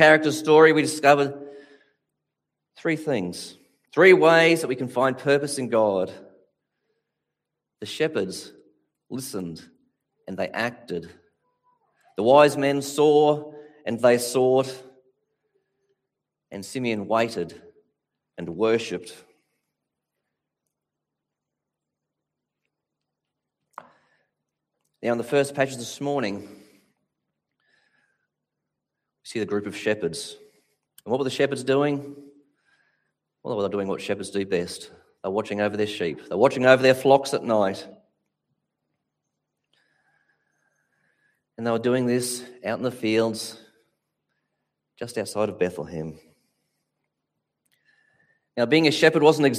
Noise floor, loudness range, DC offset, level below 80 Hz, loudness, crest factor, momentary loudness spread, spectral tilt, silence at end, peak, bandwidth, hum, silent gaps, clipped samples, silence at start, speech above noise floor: -85 dBFS; 12 LU; under 0.1%; -70 dBFS; -22 LUFS; 24 dB; 19 LU; -4.5 dB/octave; 0 s; -2 dBFS; 15.5 kHz; none; none; under 0.1%; 0 s; 63 dB